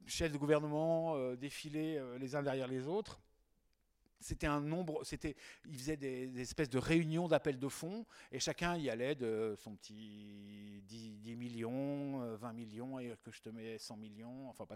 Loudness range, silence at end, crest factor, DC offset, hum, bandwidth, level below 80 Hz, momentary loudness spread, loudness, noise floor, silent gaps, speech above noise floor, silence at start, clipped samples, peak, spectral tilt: 7 LU; 0 s; 22 dB; under 0.1%; none; 16 kHz; -60 dBFS; 18 LU; -40 LUFS; -78 dBFS; none; 37 dB; 0 s; under 0.1%; -18 dBFS; -5.5 dB/octave